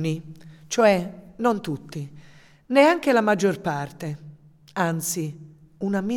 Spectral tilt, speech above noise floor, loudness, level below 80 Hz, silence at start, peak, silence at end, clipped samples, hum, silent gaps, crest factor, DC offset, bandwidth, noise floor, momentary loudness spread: -5 dB/octave; 27 dB; -23 LUFS; -60 dBFS; 0 s; -4 dBFS; 0 s; under 0.1%; none; none; 20 dB; under 0.1%; 18 kHz; -49 dBFS; 18 LU